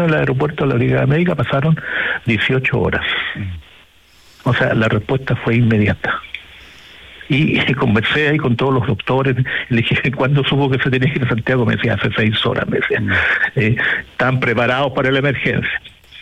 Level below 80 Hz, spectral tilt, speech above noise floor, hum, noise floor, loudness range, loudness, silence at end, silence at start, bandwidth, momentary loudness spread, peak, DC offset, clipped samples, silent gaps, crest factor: -44 dBFS; -7.5 dB/octave; 32 dB; none; -48 dBFS; 2 LU; -16 LUFS; 0 s; 0 s; 8.4 kHz; 5 LU; -4 dBFS; under 0.1%; under 0.1%; none; 12 dB